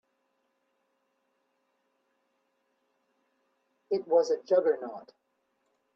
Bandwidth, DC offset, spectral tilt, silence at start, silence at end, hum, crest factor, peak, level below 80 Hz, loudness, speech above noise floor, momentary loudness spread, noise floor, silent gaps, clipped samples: 7.4 kHz; under 0.1%; -5 dB/octave; 3.9 s; 0.95 s; none; 22 dB; -12 dBFS; -88 dBFS; -28 LUFS; 49 dB; 14 LU; -77 dBFS; none; under 0.1%